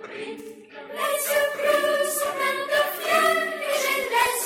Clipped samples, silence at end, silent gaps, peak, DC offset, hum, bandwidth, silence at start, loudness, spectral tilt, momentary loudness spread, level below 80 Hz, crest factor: under 0.1%; 0 s; none; -8 dBFS; under 0.1%; none; 16.5 kHz; 0 s; -23 LUFS; -0.5 dB/octave; 15 LU; -66 dBFS; 16 dB